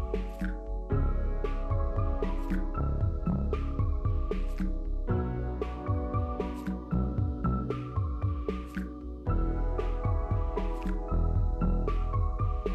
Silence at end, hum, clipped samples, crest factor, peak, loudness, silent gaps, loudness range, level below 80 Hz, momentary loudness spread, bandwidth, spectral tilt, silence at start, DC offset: 0 s; none; under 0.1%; 10 dB; -20 dBFS; -33 LUFS; none; 1 LU; -32 dBFS; 5 LU; 5.2 kHz; -9.5 dB/octave; 0 s; under 0.1%